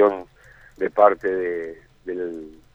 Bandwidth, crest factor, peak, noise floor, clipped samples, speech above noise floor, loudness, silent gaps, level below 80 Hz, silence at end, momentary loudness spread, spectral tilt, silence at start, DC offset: 7.2 kHz; 20 dB; -2 dBFS; -50 dBFS; under 0.1%; 29 dB; -22 LUFS; none; -56 dBFS; 0.25 s; 19 LU; -7.5 dB/octave; 0 s; under 0.1%